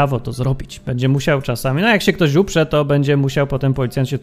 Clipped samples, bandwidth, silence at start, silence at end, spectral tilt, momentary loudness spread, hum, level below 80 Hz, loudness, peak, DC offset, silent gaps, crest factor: under 0.1%; 15.5 kHz; 0 s; 0 s; -6.5 dB/octave; 7 LU; none; -36 dBFS; -17 LUFS; 0 dBFS; under 0.1%; none; 16 dB